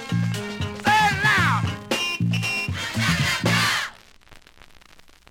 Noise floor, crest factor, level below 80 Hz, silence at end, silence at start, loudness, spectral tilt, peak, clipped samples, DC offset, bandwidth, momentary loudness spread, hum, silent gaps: -50 dBFS; 16 dB; -48 dBFS; 0.9 s; 0 s; -21 LUFS; -4 dB/octave; -8 dBFS; under 0.1%; under 0.1%; 17 kHz; 8 LU; none; none